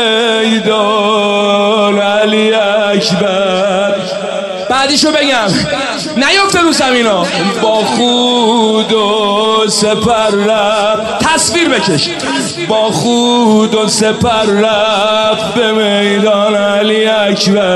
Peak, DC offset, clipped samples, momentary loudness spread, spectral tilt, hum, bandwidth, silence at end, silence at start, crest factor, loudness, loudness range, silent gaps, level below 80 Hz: 0 dBFS; 0.1%; under 0.1%; 4 LU; -3.5 dB/octave; none; 12.5 kHz; 0 s; 0 s; 10 dB; -10 LUFS; 1 LU; none; -44 dBFS